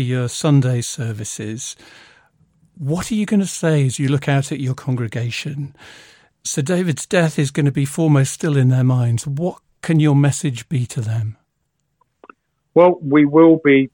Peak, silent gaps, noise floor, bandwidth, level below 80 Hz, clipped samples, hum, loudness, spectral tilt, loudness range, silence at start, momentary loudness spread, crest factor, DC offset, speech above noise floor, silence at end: -2 dBFS; none; -71 dBFS; 17 kHz; -56 dBFS; under 0.1%; none; -18 LUFS; -6.5 dB/octave; 5 LU; 0 s; 13 LU; 16 dB; under 0.1%; 54 dB; 0.05 s